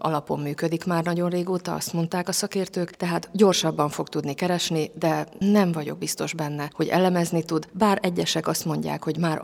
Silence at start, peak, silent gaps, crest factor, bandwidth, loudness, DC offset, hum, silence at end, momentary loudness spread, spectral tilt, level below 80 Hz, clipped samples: 0 s; -6 dBFS; none; 18 dB; 18 kHz; -25 LUFS; under 0.1%; none; 0 s; 8 LU; -5 dB/octave; -64 dBFS; under 0.1%